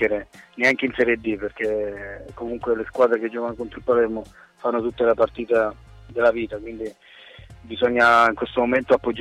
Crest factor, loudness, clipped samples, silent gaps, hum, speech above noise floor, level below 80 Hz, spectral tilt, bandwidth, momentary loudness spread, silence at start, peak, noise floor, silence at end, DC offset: 16 dB; -21 LUFS; under 0.1%; none; none; 23 dB; -50 dBFS; -5.5 dB/octave; 11.5 kHz; 16 LU; 0 s; -6 dBFS; -44 dBFS; 0 s; under 0.1%